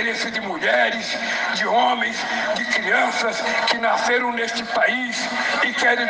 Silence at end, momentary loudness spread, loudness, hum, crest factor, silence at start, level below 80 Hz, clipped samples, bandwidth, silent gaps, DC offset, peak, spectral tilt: 0 s; 5 LU; -20 LUFS; none; 16 dB; 0 s; -64 dBFS; under 0.1%; 10 kHz; none; under 0.1%; -6 dBFS; -2 dB/octave